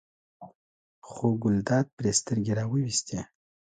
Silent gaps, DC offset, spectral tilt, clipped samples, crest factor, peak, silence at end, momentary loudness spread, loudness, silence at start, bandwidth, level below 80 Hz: 0.55-1.02 s, 1.93-1.97 s; under 0.1%; -5 dB/octave; under 0.1%; 18 dB; -12 dBFS; 0.55 s; 12 LU; -28 LUFS; 0.4 s; 9.6 kHz; -58 dBFS